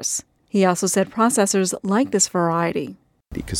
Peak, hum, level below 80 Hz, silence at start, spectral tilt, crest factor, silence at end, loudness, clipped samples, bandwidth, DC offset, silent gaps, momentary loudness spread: -6 dBFS; none; -48 dBFS; 0 s; -4 dB/octave; 16 dB; 0 s; -20 LUFS; under 0.1%; 16.5 kHz; under 0.1%; none; 11 LU